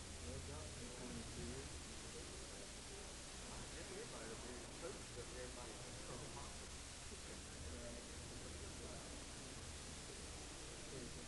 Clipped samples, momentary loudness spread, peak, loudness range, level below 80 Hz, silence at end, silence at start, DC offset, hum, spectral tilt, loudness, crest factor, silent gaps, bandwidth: under 0.1%; 2 LU; -36 dBFS; 1 LU; -60 dBFS; 0 s; 0 s; under 0.1%; none; -3 dB/octave; -52 LUFS; 16 dB; none; 11.5 kHz